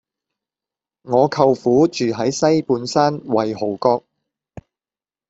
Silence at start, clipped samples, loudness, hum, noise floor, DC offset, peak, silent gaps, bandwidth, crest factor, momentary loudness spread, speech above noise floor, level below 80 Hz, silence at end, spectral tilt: 1.05 s; under 0.1%; -18 LUFS; none; under -90 dBFS; under 0.1%; -2 dBFS; none; 8 kHz; 18 dB; 5 LU; over 73 dB; -58 dBFS; 1.3 s; -5.5 dB/octave